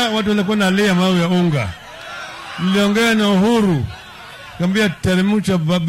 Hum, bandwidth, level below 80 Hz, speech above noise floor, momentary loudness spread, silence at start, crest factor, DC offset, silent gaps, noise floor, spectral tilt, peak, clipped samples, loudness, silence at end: none; 15.5 kHz; -44 dBFS; 20 dB; 16 LU; 0 s; 8 dB; under 0.1%; none; -36 dBFS; -5.5 dB/octave; -8 dBFS; under 0.1%; -16 LUFS; 0 s